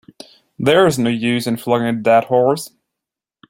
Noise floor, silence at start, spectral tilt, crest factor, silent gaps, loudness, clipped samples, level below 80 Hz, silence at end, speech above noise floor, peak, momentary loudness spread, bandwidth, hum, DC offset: -84 dBFS; 0.6 s; -5.5 dB/octave; 16 dB; none; -16 LUFS; under 0.1%; -58 dBFS; 0.85 s; 69 dB; -2 dBFS; 7 LU; 16.5 kHz; none; under 0.1%